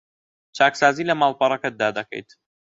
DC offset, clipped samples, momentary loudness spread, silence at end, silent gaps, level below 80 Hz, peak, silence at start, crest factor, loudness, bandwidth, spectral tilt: under 0.1%; under 0.1%; 17 LU; 0.6 s; none; -68 dBFS; -2 dBFS; 0.55 s; 20 dB; -20 LUFS; 8 kHz; -4 dB/octave